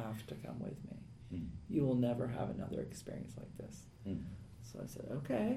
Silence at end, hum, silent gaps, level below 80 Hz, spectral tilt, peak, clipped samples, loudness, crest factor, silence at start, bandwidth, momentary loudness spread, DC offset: 0 s; none; none; -60 dBFS; -7.5 dB/octave; -24 dBFS; under 0.1%; -42 LUFS; 18 dB; 0 s; 15 kHz; 16 LU; under 0.1%